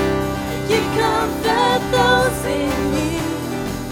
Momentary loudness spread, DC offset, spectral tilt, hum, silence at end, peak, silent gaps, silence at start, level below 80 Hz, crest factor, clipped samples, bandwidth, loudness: 8 LU; under 0.1%; -4.5 dB/octave; none; 0 s; -2 dBFS; none; 0 s; -34 dBFS; 18 dB; under 0.1%; 18.5 kHz; -19 LUFS